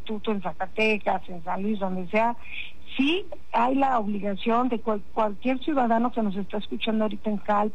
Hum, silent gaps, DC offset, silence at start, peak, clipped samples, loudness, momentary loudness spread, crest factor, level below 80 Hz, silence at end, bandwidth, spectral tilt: none; none; 3%; 0.05 s; -12 dBFS; under 0.1%; -26 LUFS; 8 LU; 12 dB; -54 dBFS; 0.05 s; 8.8 kHz; -7 dB/octave